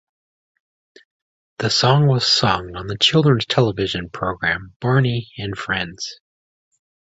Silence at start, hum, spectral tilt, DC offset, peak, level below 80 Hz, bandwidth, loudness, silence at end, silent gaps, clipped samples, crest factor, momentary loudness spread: 1.6 s; none; -5 dB/octave; under 0.1%; -2 dBFS; -48 dBFS; 8 kHz; -18 LUFS; 1 s; 4.76-4.80 s; under 0.1%; 18 dB; 13 LU